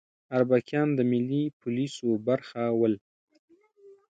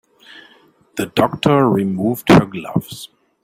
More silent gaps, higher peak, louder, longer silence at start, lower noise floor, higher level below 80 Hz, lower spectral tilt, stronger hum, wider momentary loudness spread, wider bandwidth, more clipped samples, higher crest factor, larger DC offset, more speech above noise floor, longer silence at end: first, 1.53-1.60 s, 3.01-3.28 s, 3.39-3.48 s vs none; second, -10 dBFS vs 0 dBFS; second, -27 LUFS vs -16 LUFS; second, 0.3 s vs 0.95 s; first, -56 dBFS vs -52 dBFS; second, -74 dBFS vs -48 dBFS; about the same, -7.5 dB/octave vs -6.5 dB/octave; neither; second, 6 LU vs 19 LU; second, 9 kHz vs 16 kHz; neither; about the same, 18 dB vs 16 dB; neither; second, 30 dB vs 36 dB; second, 0.25 s vs 0.4 s